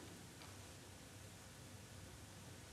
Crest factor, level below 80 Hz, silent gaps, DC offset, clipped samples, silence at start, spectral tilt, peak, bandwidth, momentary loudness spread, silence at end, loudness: 16 dB; -70 dBFS; none; under 0.1%; under 0.1%; 0 s; -3.5 dB/octave; -40 dBFS; 15.5 kHz; 1 LU; 0 s; -57 LUFS